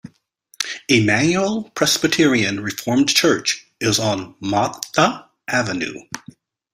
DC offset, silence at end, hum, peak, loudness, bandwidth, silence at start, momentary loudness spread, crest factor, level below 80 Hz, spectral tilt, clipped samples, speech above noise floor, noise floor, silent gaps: under 0.1%; 0.55 s; none; 0 dBFS; -18 LUFS; 16 kHz; 0.05 s; 11 LU; 20 dB; -56 dBFS; -3.5 dB/octave; under 0.1%; 38 dB; -57 dBFS; none